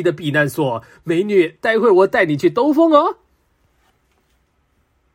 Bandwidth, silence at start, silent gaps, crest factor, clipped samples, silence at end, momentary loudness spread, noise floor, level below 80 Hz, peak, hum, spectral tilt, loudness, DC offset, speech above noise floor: 16 kHz; 0 s; none; 16 dB; under 0.1%; 2 s; 9 LU; -63 dBFS; -60 dBFS; 0 dBFS; none; -6.5 dB/octave; -16 LUFS; under 0.1%; 47 dB